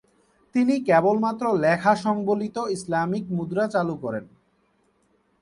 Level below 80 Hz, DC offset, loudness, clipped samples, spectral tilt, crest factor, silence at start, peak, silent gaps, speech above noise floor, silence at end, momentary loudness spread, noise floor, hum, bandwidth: -64 dBFS; under 0.1%; -23 LUFS; under 0.1%; -6.5 dB/octave; 18 dB; 0.55 s; -6 dBFS; none; 43 dB; 1.15 s; 9 LU; -66 dBFS; none; 11.5 kHz